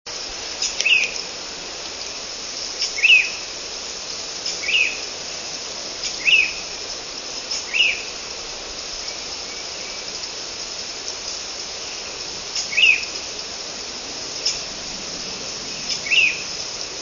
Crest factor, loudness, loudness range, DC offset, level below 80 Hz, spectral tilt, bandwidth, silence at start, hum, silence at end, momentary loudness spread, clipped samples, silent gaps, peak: 22 dB; -21 LUFS; 8 LU; under 0.1%; -52 dBFS; 1 dB/octave; 7.4 kHz; 0.05 s; none; 0 s; 13 LU; under 0.1%; none; -2 dBFS